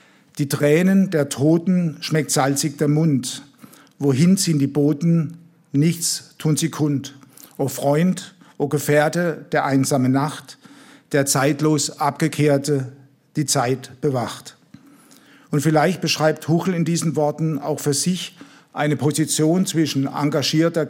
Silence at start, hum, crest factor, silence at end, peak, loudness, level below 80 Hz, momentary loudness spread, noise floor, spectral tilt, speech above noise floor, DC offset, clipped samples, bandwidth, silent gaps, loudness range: 0.35 s; none; 16 dB; 0 s; -4 dBFS; -20 LUFS; -68 dBFS; 9 LU; -49 dBFS; -5 dB/octave; 30 dB; under 0.1%; under 0.1%; 16.5 kHz; none; 3 LU